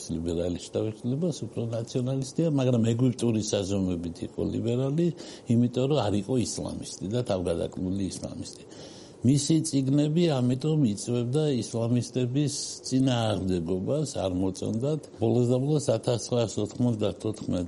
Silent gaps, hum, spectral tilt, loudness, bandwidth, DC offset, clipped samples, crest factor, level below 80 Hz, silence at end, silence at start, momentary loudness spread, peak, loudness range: none; none; -6.5 dB/octave; -27 LUFS; 11.5 kHz; under 0.1%; under 0.1%; 16 dB; -56 dBFS; 0 s; 0 s; 8 LU; -12 dBFS; 3 LU